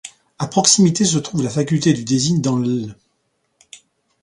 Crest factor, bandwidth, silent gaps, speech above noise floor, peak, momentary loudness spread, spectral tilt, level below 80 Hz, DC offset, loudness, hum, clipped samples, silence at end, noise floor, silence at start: 18 dB; 11.5 kHz; none; 51 dB; 0 dBFS; 13 LU; -4.5 dB/octave; -54 dBFS; under 0.1%; -17 LUFS; none; under 0.1%; 0.45 s; -68 dBFS; 0.05 s